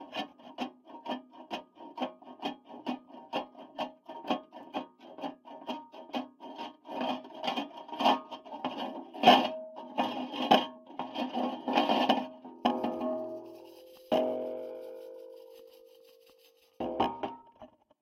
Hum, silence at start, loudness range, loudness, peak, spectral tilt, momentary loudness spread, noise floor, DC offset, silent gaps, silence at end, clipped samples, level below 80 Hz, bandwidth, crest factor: none; 0 s; 12 LU; -33 LUFS; -8 dBFS; -4.5 dB/octave; 19 LU; -63 dBFS; under 0.1%; none; 0.35 s; under 0.1%; -74 dBFS; 16.5 kHz; 28 dB